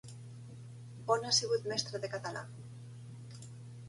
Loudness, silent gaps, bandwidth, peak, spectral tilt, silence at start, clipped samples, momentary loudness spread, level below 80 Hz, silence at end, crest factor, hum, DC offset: -34 LUFS; none; 11.5 kHz; -16 dBFS; -2.5 dB/octave; 0.05 s; under 0.1%; 21 LU; -72 dBFS; 0 s; 22 dB; none; under 0.1%